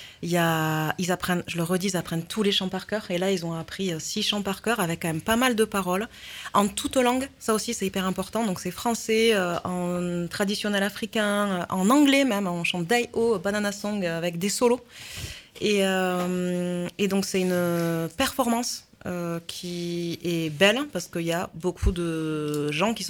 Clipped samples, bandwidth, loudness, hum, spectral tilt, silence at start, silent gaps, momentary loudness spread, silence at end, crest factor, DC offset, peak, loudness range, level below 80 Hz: under 0.1%; 18.5 kHz; -25 LUFS; none; -4.5 dB/octave; 0 s; none; 9 LU; 0 s; 20 dB; under 0.1%; -6 dBFS; 3 LU; -44 dBFS